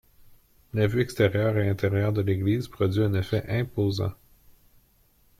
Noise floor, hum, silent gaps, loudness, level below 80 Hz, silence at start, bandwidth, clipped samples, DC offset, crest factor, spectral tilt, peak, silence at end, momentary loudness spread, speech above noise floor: -62 dBFS; none; none; -26 LUFS; -52 dBFS; 0.75 s; 15 kHz; under 0.1%; under 0.1%; 18 dB; -7.5 dB/octave; -8 dBFS; 1.25 s; 5 LU; 38 dB